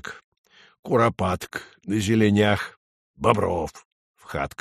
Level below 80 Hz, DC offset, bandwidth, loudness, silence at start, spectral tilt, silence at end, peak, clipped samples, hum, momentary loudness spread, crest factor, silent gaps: -50 dBFS; under 0.1%; 13.5 kHz; -23 LUFS; 0.05 s; -6 dB/octave; 0.1 s; -2 dBFS; under 0.1%; none; 16 LU; 22 dB; 0.24-0.32 s, 0.38-0.44 s, 0.79-0.83 s, 2.77-3.14 s, 3.85-4.14 s